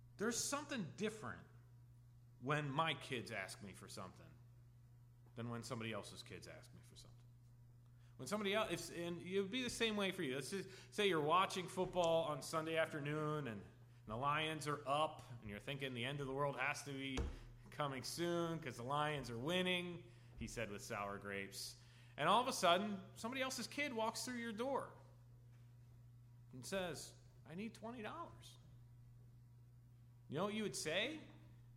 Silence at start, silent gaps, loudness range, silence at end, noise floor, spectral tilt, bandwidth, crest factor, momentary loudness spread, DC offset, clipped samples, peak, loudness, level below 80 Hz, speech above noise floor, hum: 0 s; none; 11 LU; 0 s; -64 dBFS; -4 dB/octave; 16 kHz; 24 dB; 23 LU; under 0.1%; under 0.1%; -20 dBFS; -43 LUFS; -66 dBFS; 21 dB; 60 Hz at -65 dBFS